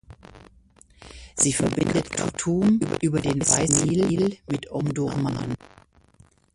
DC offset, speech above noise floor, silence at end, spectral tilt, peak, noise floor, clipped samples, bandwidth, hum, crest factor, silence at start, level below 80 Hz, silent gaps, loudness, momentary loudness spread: under 0.1%; 34 dB; 0.9 s; -4.5 dB/octave; 0 dBFS; -57 dBFS; under 0.1%; 11.5 kHz; none; 24 dB; 0.1 s; -48 dBFS; none; -23 LUFS; 11 LU